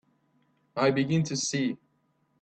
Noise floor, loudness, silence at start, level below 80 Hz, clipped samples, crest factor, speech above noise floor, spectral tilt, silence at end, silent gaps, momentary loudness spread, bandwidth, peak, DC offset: -71 dBFS; -28 LUFS; 0.75 s; -66 dBFS; under 0.1%; 18 dB; 45 dB; -5 dB/octave; 0.65 s; none; 12 LU; 9 kHz; -12 dBFS; under 0.1%